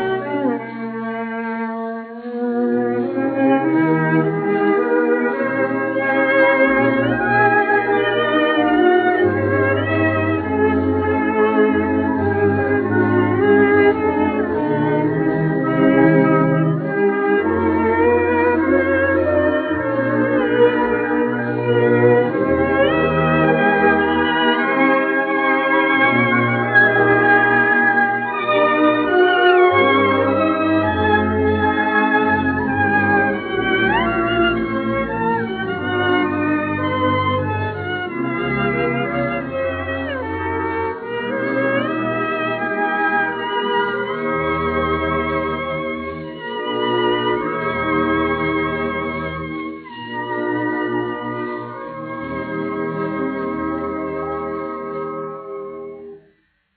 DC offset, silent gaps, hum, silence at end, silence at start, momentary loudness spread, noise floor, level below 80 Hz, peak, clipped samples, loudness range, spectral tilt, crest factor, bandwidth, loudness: under 0.1%; none; none; 0.6 s; 0 s; 11 LU; -59 dBFS; -48 dBFS; -2 dBFS; under 0.1%; 8 LU; -4.5 dB/octave; 16 dB; 4.6 kHz; -17 LUFS